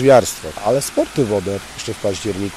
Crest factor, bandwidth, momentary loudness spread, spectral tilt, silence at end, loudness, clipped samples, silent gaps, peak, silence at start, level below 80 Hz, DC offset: 16 dB; 16 kHz; 12 LU; -5 dB/octave; 0 s; -19 LUFS; under 0.1%; none; -2 dBFS; 0 s; -46 dBFS; under 0.1%